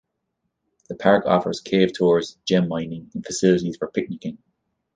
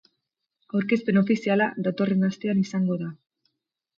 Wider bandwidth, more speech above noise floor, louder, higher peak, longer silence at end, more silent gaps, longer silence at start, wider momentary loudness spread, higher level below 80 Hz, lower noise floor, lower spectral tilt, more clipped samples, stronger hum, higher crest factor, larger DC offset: first, 9.6 kHz vs 7.2 kHz; about the same, 56 dB vs 57 dB; first, -21 LUFS vs -24 LUFS; first, -2 dBFS vs -10 dBFS; second, 0.6 s vs 0.85 s; neither; first, 0.9 s vs 0.75 s; first, 14 LU vs 7 LU; first, -58 dBFS vs -70 dBFS; second, -77 dBFS vs -81 dBFS; second, -5.5 dB/octave vs -7.5 dB/octave; neither; neither; about the same, 20 dB vs 16 dB; neither